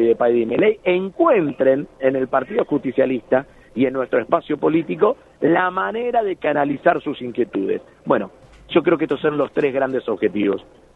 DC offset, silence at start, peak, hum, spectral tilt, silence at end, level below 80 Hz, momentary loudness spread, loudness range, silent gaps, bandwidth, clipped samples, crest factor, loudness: under 0.1%; 0 s; -2 dBFS; none; -8.5 dB/octave; 0.35 s; -56 dBFS; 6 LU; 2 LU; none; 4.1 kHz; under 0.1%; 18 dB; -20 LUFS